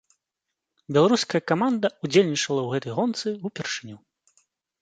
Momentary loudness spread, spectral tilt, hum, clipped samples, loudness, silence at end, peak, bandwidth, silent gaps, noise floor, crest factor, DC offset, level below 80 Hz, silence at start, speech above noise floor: 11 LU; -5 dB/octave; none; under 0.1%; -24 LUFS; 0.85 s; -4 dBFS; 9.4 kHz; none; -84 dBFS; 22 dB; under 0.1%; -70 dBFS; 0.9 s; 61 dB